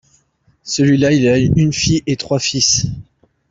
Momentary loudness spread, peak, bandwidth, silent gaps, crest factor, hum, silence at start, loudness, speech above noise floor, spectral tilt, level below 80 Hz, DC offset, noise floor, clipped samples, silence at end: 11 LU; -2 dBFS; 8 kHz; none; 14 dB; none; 0.65 s; -14 LUFS; 43 dB; -4.5 dB/octave; -40 dBFS; under 0.1%; -58 dBFS; under 0.1%; 0.5 s